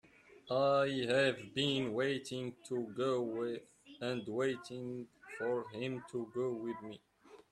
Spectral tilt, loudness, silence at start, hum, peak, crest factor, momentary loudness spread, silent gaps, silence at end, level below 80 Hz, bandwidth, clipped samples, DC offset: -5.5 dB/octave; -37 LUFS; 0.3 s; none; -18 dBFS; 18 dB; 13 LU; none; 0.1 s; -76 dBFS; 12.5 kHz; under 0.1%; under 0.1%